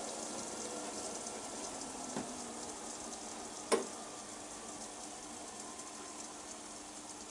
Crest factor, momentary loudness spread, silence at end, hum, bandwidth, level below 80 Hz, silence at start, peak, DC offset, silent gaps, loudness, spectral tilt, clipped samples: 26 dB; 8 LU; 0 s; none; 11.5 kHz; -72 dBFS; 0 s; -18 dBFS; under 0.1%; none; -43 LUFS; -2 dB/octave; under 0.1%